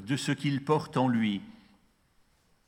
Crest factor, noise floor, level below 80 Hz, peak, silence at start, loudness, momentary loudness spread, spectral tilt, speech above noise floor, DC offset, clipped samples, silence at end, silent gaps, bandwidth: 18 dB; -67 dBFS; -70 dBFS; -12 dBFS; 0 s; -29 LUFS; 5 LU; -6 dB/octave; 38 dB; under 0.1%; under 0.1%; 1.15 s; none; 16.5 kHz